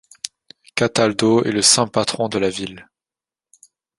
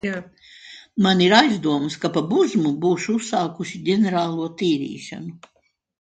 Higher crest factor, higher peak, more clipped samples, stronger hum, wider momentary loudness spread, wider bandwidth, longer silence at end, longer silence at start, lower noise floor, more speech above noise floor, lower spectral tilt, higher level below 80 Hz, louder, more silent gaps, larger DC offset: about the same, 20 dB vs 20 dB; about the same, 0 dBFS vs 0 dBFS; neither; neither; about the same, 19 LU vs 18 LU; first, 11.5 kHz vs 9.4 kHz; first, 1.15 s vs 0.65 s; first, 0.25 s vs 0.05 s; first, under -90 dBFS vs -44 dBFS; first, over 72 dB vs 24 dB; second, -3 dB/octave vs -5 dB/octave; first, -56 dBFS vs -64 dBFS; first, -17 LUFS vs -20 LUFS; neither; neither